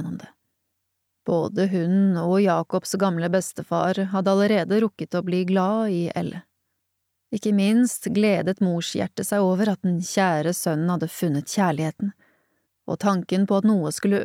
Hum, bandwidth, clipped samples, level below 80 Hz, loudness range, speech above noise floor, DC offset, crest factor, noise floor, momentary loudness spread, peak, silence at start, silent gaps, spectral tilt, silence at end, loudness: none; 16 kHz; under 0.1%; -68 dBFS; 3 LU; 55 dB; under 0.1%; 14 dB; -77 dBFS; 8 LU; -10 dBFS; 0 s; none; -6 dB/octave; 0 s; -23 LUFS